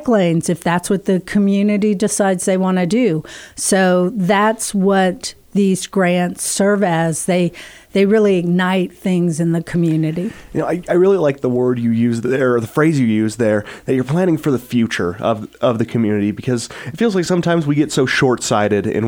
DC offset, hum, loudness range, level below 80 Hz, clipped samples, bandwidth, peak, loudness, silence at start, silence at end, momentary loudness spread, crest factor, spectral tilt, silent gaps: under 0.1%; none; 2 LU; -50 dBFS; under 0.1%; 19 kHz; -2 dBFS; -16 LUFS; 0 s; 0 s; 6 LU; 14 dB; -5.5 dB/octave; none